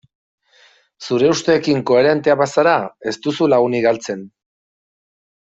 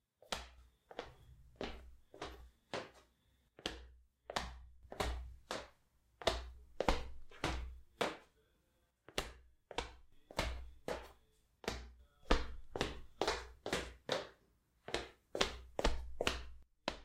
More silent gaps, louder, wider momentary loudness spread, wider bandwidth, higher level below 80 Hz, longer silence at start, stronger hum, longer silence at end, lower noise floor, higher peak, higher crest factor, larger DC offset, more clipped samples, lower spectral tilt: neither; first, -16 LUFS vs -43 LUFS; second, 10 LU vs 18 LU; second, 8 kHz vs 16 kHz; second, -60 dBFS vs -50 dBFS; first, 1 s vs 0.3 s; neither; first, 1.25 s vs 0 s; second, -53 dBFS vs -78 dBFS; first, -2 dBFS vs -10 dBFS; second, 16 dB vs 34 dB; neither; neither; first, -5 dB/octave vs -3.5 dB/octave